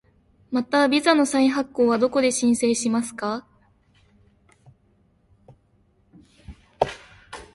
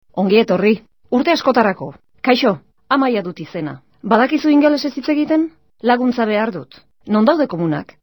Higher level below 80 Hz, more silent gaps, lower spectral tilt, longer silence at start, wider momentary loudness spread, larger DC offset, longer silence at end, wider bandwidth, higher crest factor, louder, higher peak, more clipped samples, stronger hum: about the same, -56 dBFS vs -60 dBFS; neither; second, -3.5 dB/octave vs -6.5 dB/octave; first, 0.5 s vs 0.15 s; about the same, 12 LU vs 13 LU; second, under 0.1% vs 0.2%; about the same, 0.1 s vs 0.2 s; second, 11.5 kHz vs over 20 kHz; first, 22 dB vs 16 dB; second, -22 LUFS vs -16 LUFS; about the same, -2 dBFS vs 0 dBFS; neither; neither